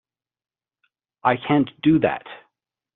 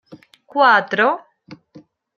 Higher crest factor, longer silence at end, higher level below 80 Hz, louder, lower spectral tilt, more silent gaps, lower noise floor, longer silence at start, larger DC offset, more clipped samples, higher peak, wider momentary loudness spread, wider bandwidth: about the same, 20 dB vs 20 dB; about the same, 0.6 s vs 0.65 s; first, -58 dBFS vs -76 dBFS; second, -21 LUFS vs -16 LUFS; about the same, -5.5 dB/octave vs -5 dB/octave; neither; first, -73 dBFS vs -48 dBFS; first, 1.25 s vs 0.1 s; neither; neither; second, -4 dBFS vs 0 dBFS; about the same, 12 LU vs 13 LU; second, 4.1 kHz vs 7.2 kHz